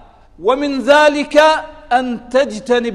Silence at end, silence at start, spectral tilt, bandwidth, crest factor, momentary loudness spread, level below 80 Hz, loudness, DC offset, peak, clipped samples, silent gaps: 0 s; 0.4 s; -3.5 dB/octave; 12 kHz; 14 dB; 7 LU; -44 dBFS; -14 LUFS; under 0.1%; 0 dBFS; under 0.1%; none